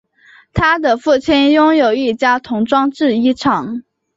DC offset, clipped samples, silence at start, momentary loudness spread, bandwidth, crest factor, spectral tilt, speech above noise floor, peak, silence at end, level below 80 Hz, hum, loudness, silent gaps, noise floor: under 0.1%; under 0.1%; 0.55 s; 7 LU; 7.8 kHz; 12 dB; -5.5 dB/octave; 34 dB; -2 dBFS; 0.35 s; -40 dBFS; none; -14 LUFS; none; -47 dBFS